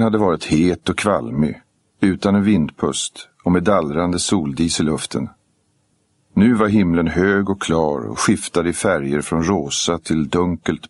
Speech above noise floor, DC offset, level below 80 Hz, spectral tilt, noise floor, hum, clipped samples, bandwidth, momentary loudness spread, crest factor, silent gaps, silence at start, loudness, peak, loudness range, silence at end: 46 dB; under 0.1%; -42 dBFS; -5 dB/octave; -64 dBFS; none; under 0.1%; 11.5 kHz; 6 LU; 18 dB; none; 0 s; -18 LUFS; -2 dBFS; 2 LU; 0.05 s